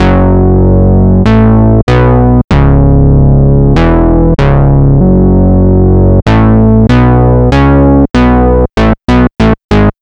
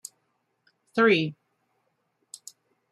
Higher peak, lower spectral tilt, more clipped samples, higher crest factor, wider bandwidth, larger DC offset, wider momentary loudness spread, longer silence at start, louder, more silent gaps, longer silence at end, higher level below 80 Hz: first, 0 dBFS vs -10 dBFS; first, -9.5 dB/octave vs -5 dB/octave; neither; second, 6 dB vs 20 dB; second, 7.4 kHz vs 14.5 kHz; first, 3% vs under 0.1%; second, 3 LU vs 24 LU; second, 0 s vs 0.95 s; first, -7 LUFS vs -24 LUFS; first, 1.83-1.87 s, 2.44-2.48 s, 9.64-9.69 s vs none; second, 0.1 s vs 1.6 s; first, -12 dBFS vs -78 dBFS